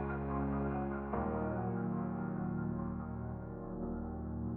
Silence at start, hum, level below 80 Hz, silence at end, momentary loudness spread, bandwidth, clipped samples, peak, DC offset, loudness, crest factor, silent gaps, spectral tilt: 0 s; none; -50 dBFS; 0 s; 6 LU; 3.1 kHz; under 0.1%; -22 dBFS; under 0.1%; -39 LUFS; 16 dB; none; -12.5 dB/octave